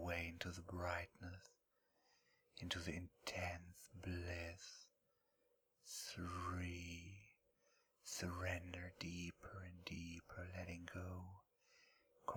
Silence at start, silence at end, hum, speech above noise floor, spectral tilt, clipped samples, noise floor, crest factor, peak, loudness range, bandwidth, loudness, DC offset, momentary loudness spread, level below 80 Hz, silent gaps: 0 s; 0 s; none; 36 dB; -4 dB/octave; under 0.1%; -84 dBFS; 24 dB; -26 dBFS; 3 LU; over 20 kHz; -50 LUFS; under 0.1%; 14 LU; -66 dBFS; none